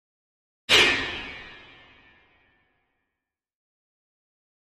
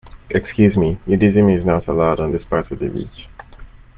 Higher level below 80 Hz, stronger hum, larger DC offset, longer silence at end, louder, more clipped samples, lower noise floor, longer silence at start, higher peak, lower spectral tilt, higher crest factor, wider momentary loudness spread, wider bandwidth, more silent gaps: second, -56 dBFS vs -36 dBFS; neither; neither; first, 3.15 s vs 0.3 s; about the same, -19 LUFS vs -17 LUFS; neither; first, -86 dBFS vs -39 dBFS; first, 0.7 s vs 0.05 s; about the same, -4 dBFS vs -2 dBFS; second, -1 dB/octave vs -8 dB/octave; first, 26 dB vs 16 dB; first, 26 LU vs 11 LU; first, 13 kHz vs 3.8 kHz; neither